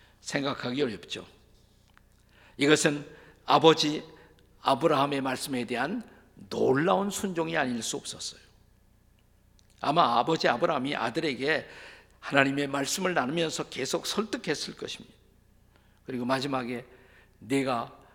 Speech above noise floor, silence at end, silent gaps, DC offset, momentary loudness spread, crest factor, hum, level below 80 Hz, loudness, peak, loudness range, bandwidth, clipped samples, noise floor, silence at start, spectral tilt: 34 dB; 0.2 s; none; under 0.1%; 15 LU; 26 dB; none; -64 dBFS; -28 LUFS; -4 dBFS; 7 LU; 18 kHz; under 0.1%; -62 dBFS; 0.25 s; -4 dB/octave